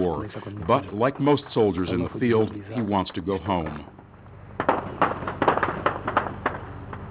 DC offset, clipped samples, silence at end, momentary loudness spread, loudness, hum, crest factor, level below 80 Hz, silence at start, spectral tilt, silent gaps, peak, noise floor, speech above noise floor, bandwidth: under 0.1%; under 0.1%; 0 s; 13 LU; -25 LUFS; none; 18 dB; -46 dBFS; 0 s; -10.5 dB/octave; none; -6 dBFS; -45 dBFS; 20 dB; 4 kHz